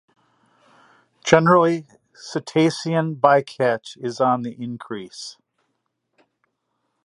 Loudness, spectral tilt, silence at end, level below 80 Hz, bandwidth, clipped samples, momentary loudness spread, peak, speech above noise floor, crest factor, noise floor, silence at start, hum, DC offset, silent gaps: -20 LUFS; -5.5 dB/octave; 1.7 s; -66 dBFS; 11 kHz; under 0.1%; 17 LU; 0 dBFS; 54 dB; 22 dB; -74 dBFS; 1.25 s; none; under 0.1%; none